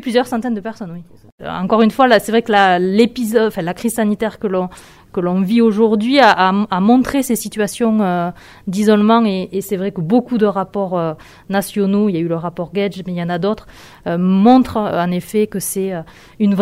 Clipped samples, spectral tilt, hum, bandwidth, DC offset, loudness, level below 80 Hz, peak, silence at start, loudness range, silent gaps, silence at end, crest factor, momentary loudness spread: under 0.1%; -5.5 dB/octave; none; 16 kHz; under 0.1%; -16 LUFS; -50 dBFS; 0 dBFS; 0 s; 4 LU; 1.32-1.38 s; 0 s; 16 dB; 13 LU